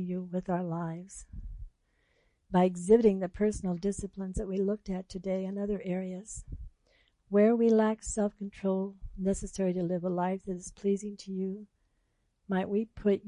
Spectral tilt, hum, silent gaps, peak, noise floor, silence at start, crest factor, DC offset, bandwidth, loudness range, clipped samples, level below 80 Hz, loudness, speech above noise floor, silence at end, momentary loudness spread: -7 dB/octave; none; none; -12 dBFS; -75 dBFS; 0 s; 20 dB; under 0.1%; 11 kHz; 5 LU; under 0.1%; -50 dBFS; -31 LUFS; 45 dB; 0 s; 18 LU